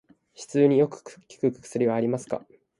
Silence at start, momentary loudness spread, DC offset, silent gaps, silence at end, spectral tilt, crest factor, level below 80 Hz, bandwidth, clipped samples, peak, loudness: 0.4 s; 14 LU; under 0.1%; none; 0.4 s; -7 dB/octave; 18 dB; -70 dBFS; 11.5 kHz; under 0.1%; -8 dBFS; -25 LUFS